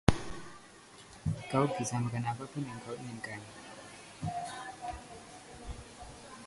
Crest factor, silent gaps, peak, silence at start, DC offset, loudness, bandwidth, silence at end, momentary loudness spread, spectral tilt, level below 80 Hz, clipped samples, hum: 32 dB; none; -4 dBFS; 0.05 s; under 0.1%; -38 LUFS; 11.5 kHz; 0 s; 18 LU; -5.5 dB/octave; -50 dBFS; under 0.1%; none